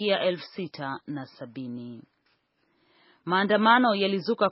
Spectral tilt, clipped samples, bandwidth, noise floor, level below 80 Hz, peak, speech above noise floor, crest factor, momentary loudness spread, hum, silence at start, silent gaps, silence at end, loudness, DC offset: -2.5 dB/octave; under 0.1%; 5.8 kHz; -71 dBFS; -78 dBFS; -6 dBFS; 45 dB; 20 dB; 20 LU; none; 0 s; none; 0 s; -25 LUFS; under 0.1%